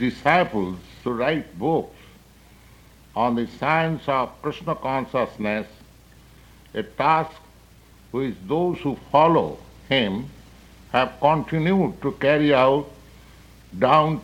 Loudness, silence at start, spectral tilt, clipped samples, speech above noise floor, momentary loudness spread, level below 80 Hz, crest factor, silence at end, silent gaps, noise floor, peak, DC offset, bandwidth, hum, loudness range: -22 LUFS; 0 s; -7 dB/octave; under 0.1%; 29 dB; 14 LU; -50 dBFS; 20 dB; 0 s; none; -50 dBFS; -2 dBFS; under 0.1%; 16.5 kHz; none; 5 LU